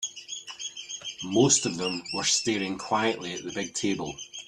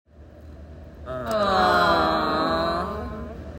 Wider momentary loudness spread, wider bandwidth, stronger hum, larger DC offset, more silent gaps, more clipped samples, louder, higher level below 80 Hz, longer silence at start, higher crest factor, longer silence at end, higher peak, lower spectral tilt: second, 15 LU vs 23 LU; second, 12.5 kHz vs 16 kHz; neither; neither; neither; neither; second, -27 LUFS vs -22 LUFS; second, -64 dBFS vs -42 dBFS; second, 0 s vs 0.2 s; about the same, 22 dB vs 18 dB; about the same, 0.05 s vs 0 s; about the same, -8 dBFS vs -8 dBFS; second, -2.5 dB/octave vs -5.5 dB/octave